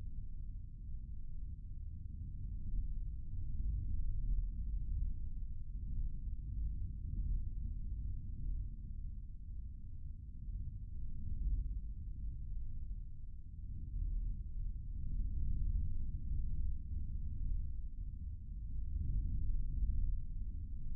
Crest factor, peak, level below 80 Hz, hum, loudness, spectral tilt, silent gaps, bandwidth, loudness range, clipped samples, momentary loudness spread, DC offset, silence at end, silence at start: 14 dB; -24 dBFS; -40 dBFS; none; -46 LUFS; -21 dB/octave; none; 0.5 kHz; 4 LU; under 0.1%; 9 LU; under 0.1%; 0 s; 0 s